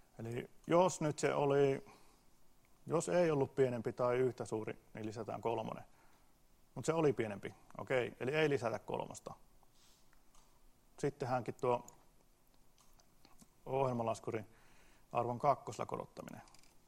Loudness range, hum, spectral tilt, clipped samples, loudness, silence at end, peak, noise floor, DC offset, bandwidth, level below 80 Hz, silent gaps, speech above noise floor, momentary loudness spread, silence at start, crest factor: 7 LU; none; -6 dB/octave; under 0.1%; -37 LUFS; 0.25 s; -18 dBFS; -67 dBFS; under 0.1%; 15.5 kHz; -70 dBFS; none; 30 dB; 16 LU; 0.2 s; 20 dB